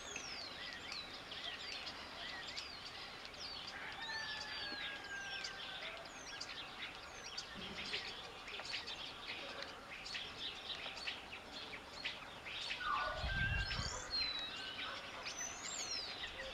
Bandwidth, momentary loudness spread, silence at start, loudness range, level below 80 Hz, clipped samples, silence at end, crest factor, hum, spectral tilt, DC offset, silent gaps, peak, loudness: 16 kHz; 9 LU; 0 s; 5 LU; -58 dBFS; under 0.1%; 0 s; 20 dB; none; -2 dB/octave; under 0.1%; none; -26 dBFS; -44 LUFS